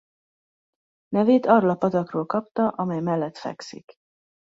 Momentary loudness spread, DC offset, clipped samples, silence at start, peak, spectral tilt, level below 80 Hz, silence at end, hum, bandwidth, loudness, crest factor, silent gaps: 16 LU; under 0.1%; under 0.1%; 1.1 s; -4 dBFS; -8 dB/octave; -68 dBFS; 0.8 s; none; 7.8 kHz; -22 LUFS; 22 dB; 2.51-2.55 s